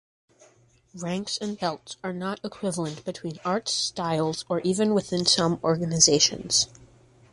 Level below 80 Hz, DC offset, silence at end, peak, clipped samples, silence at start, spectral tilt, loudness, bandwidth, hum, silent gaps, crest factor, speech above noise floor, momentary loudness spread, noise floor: -60 dBFS; under 0.1%; 0.45 s; -4 dBFS; under 0.1%; 0.95 s; -3 dB/octave; -25 LUFS; 11.5 kHz; none; none; 24 dB; 34 dB; 13 LU; -59 dBFS